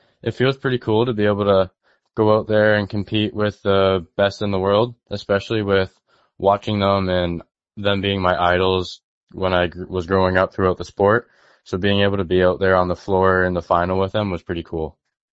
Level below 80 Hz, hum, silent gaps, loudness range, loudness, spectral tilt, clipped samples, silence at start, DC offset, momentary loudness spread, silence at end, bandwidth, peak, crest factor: -46 dBFS; none; 9.04-9.27 s; 2 LU; -19 LUFS; -7 dB/octave; under 0.1%; 0.25 s; under 0.1%; 10 LU; 0.4 s; 7.8 kHz; 0 dBFS; 18 dB